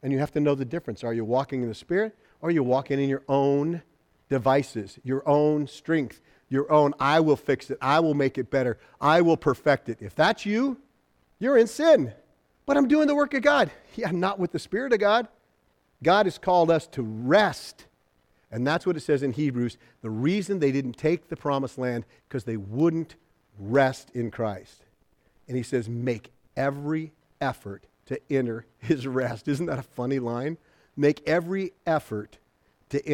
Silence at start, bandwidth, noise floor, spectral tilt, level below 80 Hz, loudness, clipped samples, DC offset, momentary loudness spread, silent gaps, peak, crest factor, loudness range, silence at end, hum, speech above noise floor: 0.05 s; 15 kHz; -68 dBFS; -6.5 dB/octave; -60 dBFS; -25 LUFS; under 0.1%; under 0.1%; 14 LU; none; -6 dBFS; 18 dB; 7 LU; 0 s; none; 43 dB